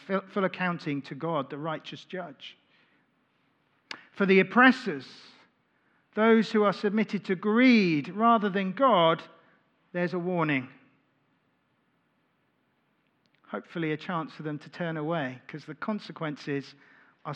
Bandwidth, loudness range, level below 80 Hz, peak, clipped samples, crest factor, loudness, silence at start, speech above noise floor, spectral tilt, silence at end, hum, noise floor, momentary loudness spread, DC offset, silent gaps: 8.2 kHz; 13 LU; under -90 dBFS; -4 dBFS; under 0.1%; 24 dB; -27 LUFS; 0.1 s; 45 dB; -7 dB/octave; 0 s; none; -72 dBFS; 19 LU; under 0.1%; none